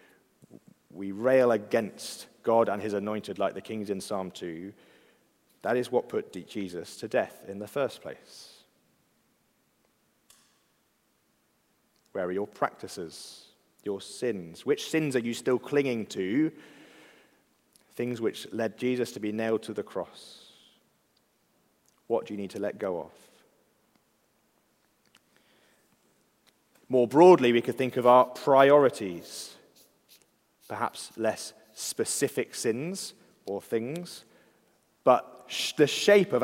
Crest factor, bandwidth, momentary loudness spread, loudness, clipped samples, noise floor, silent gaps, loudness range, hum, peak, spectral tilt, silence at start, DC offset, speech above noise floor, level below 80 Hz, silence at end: 24 dB; 16 kHz; 20 LU; -28 LUFS; under 0.1%; -71 dBFS; none; 14 LU; none; -6 dBFS; -4.5 dB/octave; 0.95 s; under 0.1%; 44 dB; -80 dBFS; 0 s